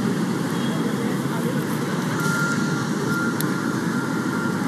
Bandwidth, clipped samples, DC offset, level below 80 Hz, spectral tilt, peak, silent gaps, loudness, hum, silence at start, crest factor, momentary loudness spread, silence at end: 15.5 kHz; under 0.1%; under 0.1%; -60 dBFS; -5.5 dB/octave; -8 dBFS; none; -23 LUFS; none; 0 s; 14 dB; 2 LU; 0 s